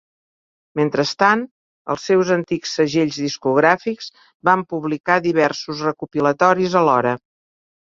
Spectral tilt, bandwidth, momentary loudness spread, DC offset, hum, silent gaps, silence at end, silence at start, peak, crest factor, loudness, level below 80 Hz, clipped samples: -5 dB/octave; 7.6 kHz; 11 LU; under 0.1%; none; 1.51-1.85 s, 4.34-4.40 s, 5.00-5.04 s; 0.65 s; 0.75 s; -2 dBFS; 18 dB; -18 LUFS; -62 dBFS; under 0.1%